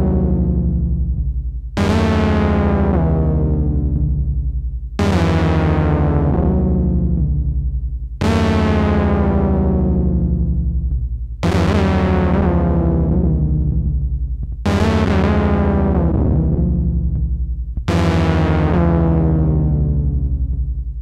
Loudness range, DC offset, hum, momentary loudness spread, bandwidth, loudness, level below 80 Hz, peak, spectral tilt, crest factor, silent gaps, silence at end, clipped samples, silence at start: 1 LU; under 0.1%; none; 7 LU; 8.8 kHz; -17 LUFS; -20 dBFS; -2 dBFS; -8.5 dB/octave; 14 dB; none; 0 s; under 0.1%; 0 s